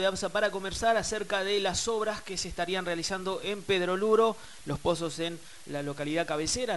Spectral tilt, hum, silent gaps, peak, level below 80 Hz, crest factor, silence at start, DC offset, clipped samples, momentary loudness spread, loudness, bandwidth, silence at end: -3.5 dB/octave; none; none; -12 dBFS; -54 dBFS; 18 dB; 0 s; 0.4%; under 0.1%; 10 LU; -30 LUFS; 11.5 kHz; 0 s